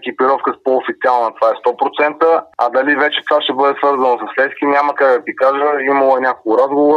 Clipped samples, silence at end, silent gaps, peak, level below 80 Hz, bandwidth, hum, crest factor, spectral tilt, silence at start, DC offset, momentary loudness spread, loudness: under 0.1%; 0 s; none; 0 dBFS; -68 dBFS; 6.6 kHz; none; 14 dB; -5 dB/octave; 0 s; under 0.1%; 4 LU; -14 LUFS